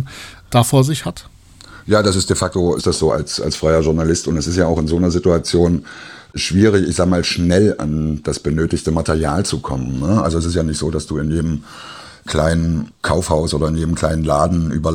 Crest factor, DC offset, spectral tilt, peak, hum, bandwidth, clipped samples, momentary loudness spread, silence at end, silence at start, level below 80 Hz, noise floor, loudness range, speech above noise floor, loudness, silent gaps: 16 dB; under 0.1%; -5.5 dB/octave; 0 dBFS; none; 16 kHz; under 0.1%; 9 LU; 0 s; 0 s; -34 dBFS; -41 dBFS; 3 LU; 24 dB; -17 LUFS; none